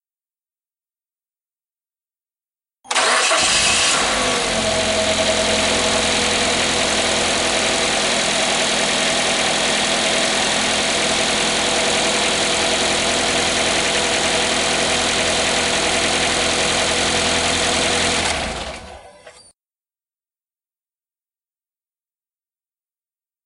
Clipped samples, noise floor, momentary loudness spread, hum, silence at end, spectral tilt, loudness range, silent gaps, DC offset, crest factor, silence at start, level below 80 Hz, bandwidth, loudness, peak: under 0.1%; under -90 dBFS; 3 LU; none; 4.15 s; -1 dB/octave; 5 LU; none; under 0.1%; 16 dB; 2.85 s; -42 dBFS; 11.5 kHz; -16 LUFS; -4 dBFS